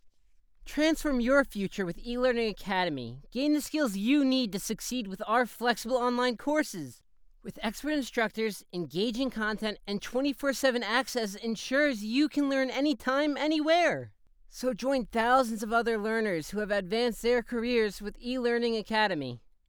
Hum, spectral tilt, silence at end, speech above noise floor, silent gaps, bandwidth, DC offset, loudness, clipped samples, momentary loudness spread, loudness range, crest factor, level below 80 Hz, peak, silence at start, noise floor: none; -4 dB/octave; 0.3 s; 32 dB; none; over 20 kHz; under 0.1%; -29 LUFS; under 0.1%; 10 LU; 3 LU; 18 dB; -52 dBFS; -12 dBFS; 0.05 s; -61 dBFS